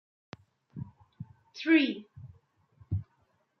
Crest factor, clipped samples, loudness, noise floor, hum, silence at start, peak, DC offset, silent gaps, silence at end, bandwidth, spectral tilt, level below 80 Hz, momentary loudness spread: 22 dB; under 0.1%; -29 LUFS; -72 dBFS; none; 0.75 s; -12 dBFS; under 0.1%; none; 0.55 s; 6.4 kHz; -5 dB/octave; -64 dBFS; 28 LU